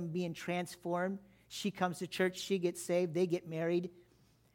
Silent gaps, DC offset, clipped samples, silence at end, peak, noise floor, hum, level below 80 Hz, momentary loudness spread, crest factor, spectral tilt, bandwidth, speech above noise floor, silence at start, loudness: none; under 0.1%; under 0.1%; 0.55 s; -18 dBFS; -68 dBFS; none; -76 dBFS; 6 LU; 18 dB; -5.5 dB/octave; 17 kHz; 32 dB; 0 s; -36 LUFS